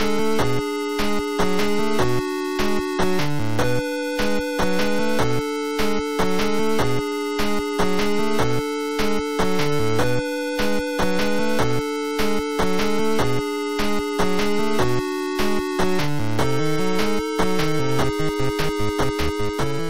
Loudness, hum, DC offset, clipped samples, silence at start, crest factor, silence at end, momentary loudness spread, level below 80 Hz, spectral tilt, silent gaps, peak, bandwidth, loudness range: -23 LUFS; none; 6%; under 0.1%; 0 s; 14 dB; 0 s; 3 LU; -38 dBFS; -5 dB/octave; none; -6 dBFS; 16 kHz; 0 LU